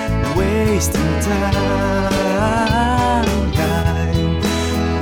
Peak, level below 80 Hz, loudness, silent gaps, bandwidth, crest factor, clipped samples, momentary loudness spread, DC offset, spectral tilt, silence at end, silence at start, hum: -4 dBFS; -24 dBFS; -17 LUFS; none; 20 kHz; 12 dB; under 0.1%; 2 LU; under 0.1%; -5.5 dB/octave; 0 s; 0 s; none